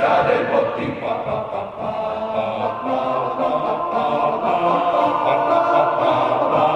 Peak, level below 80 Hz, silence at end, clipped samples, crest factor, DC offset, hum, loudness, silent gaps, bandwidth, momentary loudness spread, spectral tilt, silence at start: -4 dBFS; -54 dBFS; 0 s; under 0.1%; 14 dB; under 0.1%; none; -19 LUFS; none; 8.6 kHz; 8 LU; -7 dB/octave; 0 s